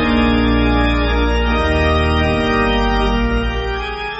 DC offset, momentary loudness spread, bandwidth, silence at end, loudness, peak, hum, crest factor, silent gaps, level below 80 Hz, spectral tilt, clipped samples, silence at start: under 0.1%; 5 LU; 8 kHz; 0 s; -16 LUFS; -2 dBFS; none; 12 dB; none; -20 dBFS; -4.5 dB/octave; under 0.1%; 0 s